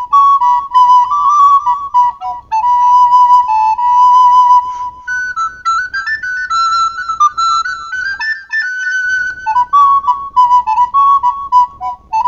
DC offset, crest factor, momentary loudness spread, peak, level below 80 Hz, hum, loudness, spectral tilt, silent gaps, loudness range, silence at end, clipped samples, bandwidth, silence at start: under 0.1%; 10 dB; 10 LU; 0 dBFS; -46 dBFS; none; -10 LUFS; 0.5 dB/octave; none; 5 LU; 0 s; under 0.1%; 7.4 kHz; 0 s